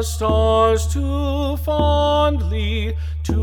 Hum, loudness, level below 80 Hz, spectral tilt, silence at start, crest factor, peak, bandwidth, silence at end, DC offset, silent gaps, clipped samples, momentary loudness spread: none; -19 LUFS; -24 dBFS; -6 dB/octave; 0 s; 14 dB; -4 dBFS; 16 kHz; 0 s; under 0.1%; none; under 0.1%; 7 LU